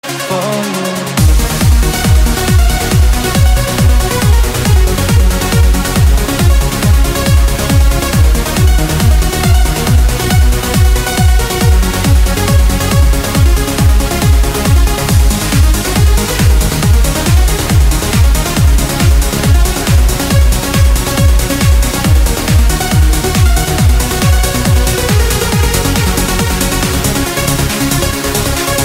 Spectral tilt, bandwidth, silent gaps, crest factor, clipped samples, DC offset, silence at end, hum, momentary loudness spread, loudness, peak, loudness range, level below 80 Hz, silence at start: -4.5 dB/octave; 16.5 kHz; none; 10 dB; under 0.1%; under 0.1%; 0 s; none; 2 LU; -11 LUFS; 0 dBFS; 1 LU; -12 dBFS; 0.05 s